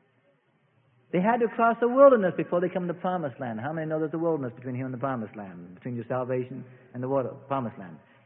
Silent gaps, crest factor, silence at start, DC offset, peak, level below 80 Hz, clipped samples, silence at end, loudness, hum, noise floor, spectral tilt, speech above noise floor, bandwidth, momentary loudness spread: none; 20 dB; 1.15 s; under 0.1%; -6 dBFS; -72 dBFS; under 0.1%; 0.3 s; -27 LUFS; none; -67 dBFS; -11.5 dB/octave; 41 dB; 3.7 kHz; 18 LU